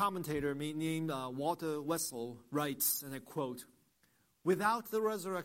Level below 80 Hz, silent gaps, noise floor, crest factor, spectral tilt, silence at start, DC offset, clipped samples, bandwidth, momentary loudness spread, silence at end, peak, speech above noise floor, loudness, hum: -70 dBFS; none; -74 dBFS; 18 dB; -4.5 dB/octave; 0 s; under 0.1%; under 0.1%; 16.5 kHz; 8 LU; 0 s; -20 dBFS; 37 dB; -36 LUFS; none